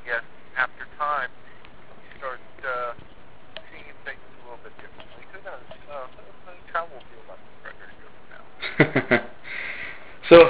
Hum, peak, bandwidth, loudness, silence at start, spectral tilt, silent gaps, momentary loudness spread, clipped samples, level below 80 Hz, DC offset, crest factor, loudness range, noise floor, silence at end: none; 0 dBFS; 4 kHz; -26 LUFS; 0.05 s; -3.5 dB/octave; none; 25 LU; under 0.1%; -54 dBFS; 1%; 26 dB; 14 LU; -49 dBFS; 0 s